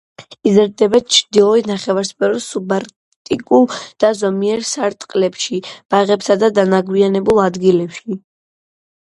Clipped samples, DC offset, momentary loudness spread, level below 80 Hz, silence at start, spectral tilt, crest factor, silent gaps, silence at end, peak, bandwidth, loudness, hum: under 0.1%; under 0.1%; 9 LU; -54 dBFS; 0.2 s; -4.5 dB/octave; 16 dB; 2.96-3.25 s, 5.85-5.89 s; 0.9 s; 0 dBFS; 11.5 kHz; -15 LUFS; none